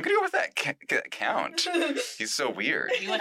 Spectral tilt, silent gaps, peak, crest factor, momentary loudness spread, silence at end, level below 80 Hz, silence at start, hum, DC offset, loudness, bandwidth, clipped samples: -2 dB/octave; none; -14 dBFS; 14 dB; 4 LU; 0 s; -82 dBFS; 0 s; none; under 0.1%; -27 LUFS; 16 kHz; under 0.1%